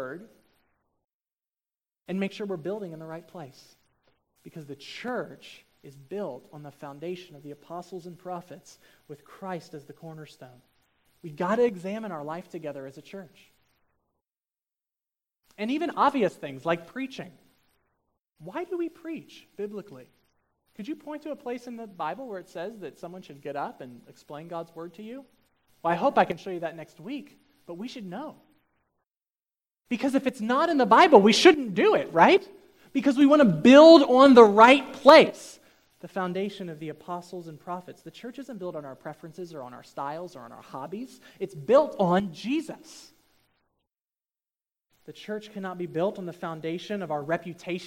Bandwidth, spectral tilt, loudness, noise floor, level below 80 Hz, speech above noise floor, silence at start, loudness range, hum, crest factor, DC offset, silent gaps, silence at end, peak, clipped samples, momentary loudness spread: 15.5 kHz; -5.5 dB/octave; -22 LUFS; under -90 dBFS; -72 dBFS; over 65 dB; 0 s; 23 LU; none; 26 dB; under 0.1%; 1.13-1.20 s; 0 s; 0 dBFS; under 0.1%; 27 LU